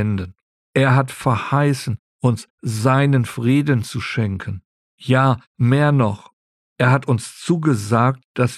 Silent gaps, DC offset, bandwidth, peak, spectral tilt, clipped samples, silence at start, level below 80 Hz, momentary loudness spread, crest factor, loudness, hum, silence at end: 0.42-0.73 s, 1.99-2.19 s, 2.50-2.58 s, 4.65-4.98 s, 5.47-5.55 s, 6.33-6.76 s, 8.24-8.34 s; under 0.1%; 13 kHz; -2 dBFS; -7 dB/octave; under 0.1%; 0 s; -54 dBFS; 11 LU; 16 dB; -19 LUFS; none; 0 s